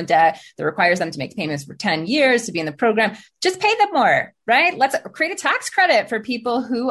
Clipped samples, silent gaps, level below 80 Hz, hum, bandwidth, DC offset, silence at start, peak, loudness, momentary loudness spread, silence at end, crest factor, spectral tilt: under 0.1%; none; -64 dBFS; none; 12.5 kHz; under 0.1%; 0 s; -4 dBFS; -19 LUFS; 9 LU; 0 s; 16 dB; -3.5 dB/octave